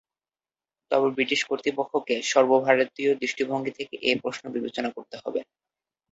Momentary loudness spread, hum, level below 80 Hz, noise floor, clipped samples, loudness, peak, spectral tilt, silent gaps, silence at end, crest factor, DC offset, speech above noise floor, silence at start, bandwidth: 12 LU; none; -72 dBFS; under -90 dBFS; under 0.1%; -25 LUFS; -4 dBFS; -3.5 dB/octave; none; 0.7 s; 22 dB; under 0.1%; over 65 dB; 0.9 s; 8 kHz